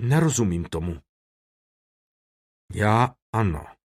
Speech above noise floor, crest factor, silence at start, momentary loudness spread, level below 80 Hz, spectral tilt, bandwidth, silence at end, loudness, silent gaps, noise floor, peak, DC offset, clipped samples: over 67 dB; 20 dB; 0 s; 14 LU; -44 dBFS; -6 dB/octave; 15 kHz; 0.2 s; -24 LUFS; 1.09-2.68 s, 3.22-3.33 s; under -90 dBFS; -6 dBFS; under 0.1%; under 0.1%